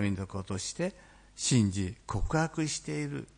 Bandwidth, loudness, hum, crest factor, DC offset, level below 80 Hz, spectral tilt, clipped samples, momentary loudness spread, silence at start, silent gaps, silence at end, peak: 10.5 kHz; -32 LUFS; none; 18 dB; under 0.1%; -46 dBFS; -5 dB/octave; under 0.1%; 10 LU; 0 s; none; 0.15 s; -14 dBFS